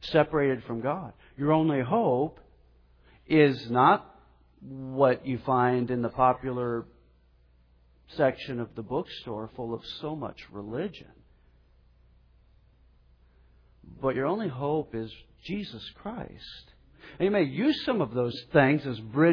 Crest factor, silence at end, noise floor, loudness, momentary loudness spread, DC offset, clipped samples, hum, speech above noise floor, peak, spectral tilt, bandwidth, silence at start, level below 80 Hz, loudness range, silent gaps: 20 dB; 0 s; -61 dBFS; -28 LUFS; 17 LU; under 0.1%; under 0.1%; none; 34 dB; -8 dBFS; -8.5 dB/octave; 5.4 kHz; 0 s; -58 dBFS; 13 LU; none